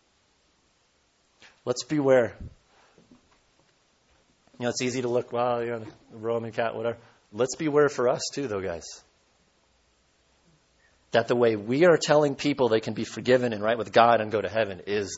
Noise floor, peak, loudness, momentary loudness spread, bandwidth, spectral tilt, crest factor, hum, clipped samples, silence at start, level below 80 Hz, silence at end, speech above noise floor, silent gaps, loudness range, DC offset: -67 dBFS; -4 dBFS; -25 LUFS; 16 LU; 8 kHz; -5 dB/octave; 22 dB; none; under 0.1%; 1.65 s; -62 dBFS; 0 s; 42 dB; none; 9 LU; under 0.1%